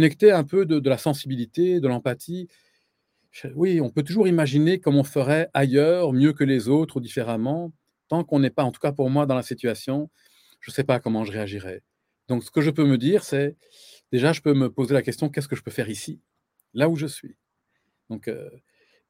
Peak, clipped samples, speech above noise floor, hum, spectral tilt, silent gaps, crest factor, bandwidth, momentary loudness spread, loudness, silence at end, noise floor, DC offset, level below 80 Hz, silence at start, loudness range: -4 dBFS; under 0.1%; 52 dB; none; -7 dB/octave; none; 20 dB; 16.5 kHz; 15 LU; -23 LUFS; 0.6 s; -75 dBFS; under 0.1%; -66 dBFS; 0 s; 7 LU